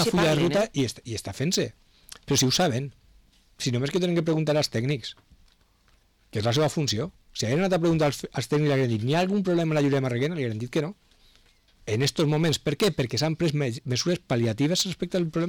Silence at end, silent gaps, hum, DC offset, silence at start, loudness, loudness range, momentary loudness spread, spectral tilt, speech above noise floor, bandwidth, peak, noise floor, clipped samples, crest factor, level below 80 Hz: 0 s; none; none; under 0.1%; 0 s; -25 LUFS; 3 LU; 9 LU; -5 dB/octave; 38 dB; 19 kHz; -14 dBFS; -62 dBFS; under 0.1%; 10 dB; -54 dBFS